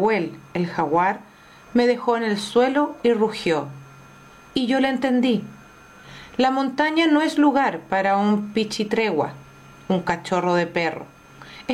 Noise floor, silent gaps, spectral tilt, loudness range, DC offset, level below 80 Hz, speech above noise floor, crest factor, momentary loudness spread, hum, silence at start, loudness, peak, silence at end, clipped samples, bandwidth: -46 dBFS; none; -5.5 dB/octave; 3 LU; under 0.1%; -60 dBFS; 26 dB; 14 dB; 11 LU; none; 0 s; -21 LUFS; -8 dBFS; 0 s; under 0.1%; 13.5 kHz